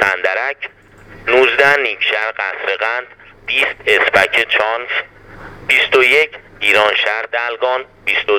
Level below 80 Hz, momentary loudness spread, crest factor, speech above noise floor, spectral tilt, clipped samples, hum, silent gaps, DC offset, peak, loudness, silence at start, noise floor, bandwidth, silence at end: -50 dBFS; 11 LU; 16 dB; 21 dB; -2.5 dB/octave; under 0.1%; none; none; under 0.1%; 0 dBFS; -14 LUFS; 0 s; -35 dBFS; 19.5 kHz; 0 s